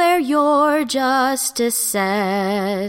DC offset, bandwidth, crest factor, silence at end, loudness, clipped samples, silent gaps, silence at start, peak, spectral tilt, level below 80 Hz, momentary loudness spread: under 0.1%; 17 kHz; 14 dB; 0 s; -17 LUFS; under 0.1%; none; 0 s; -4 dBFS; -3.5 dB/octave; -60 dBFS; 4 LU